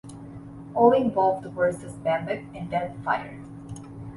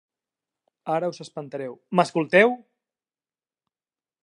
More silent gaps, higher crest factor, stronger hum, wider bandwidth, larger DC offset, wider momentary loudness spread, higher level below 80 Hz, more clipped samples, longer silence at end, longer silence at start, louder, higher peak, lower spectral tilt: neither; about the same, 20 dB vs 24 dB; neither; about the same, 11.5 kHz vs 11 kHz; neither; first, 22 LU vs 18 LU; first, -56 dBFS vs -80 dBFS; neither; second, 0 s vs 1.65 s; second, 0.05 s vs 0.85 s; second, -25 LUFS vs -22 LUFS; about the same, -6 dBFS vs -4 dBFS; about the same, -7 dB/octave vs -6 dB/octave